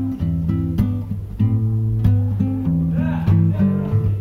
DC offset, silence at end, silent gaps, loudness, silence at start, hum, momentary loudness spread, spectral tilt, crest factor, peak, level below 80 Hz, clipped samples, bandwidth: under 0.1%; 0 s; none; -19 LUFS; 0 s; none; 5 LU; -10.5 dB/octave; 14 dB; -4 dBFS; -32 dBFS; under 0.1%; 4.1 kHz